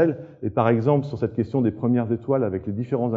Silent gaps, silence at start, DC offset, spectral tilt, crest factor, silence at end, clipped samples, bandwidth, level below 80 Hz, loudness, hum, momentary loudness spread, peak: none; 0 s; under 0.1%; -10.5 dB/octave; 18 dB; 0 s; under 0.1%; 5.2 kHz; -56 dBFS; -23 LUFS; none; 7 LU; -4 dBFS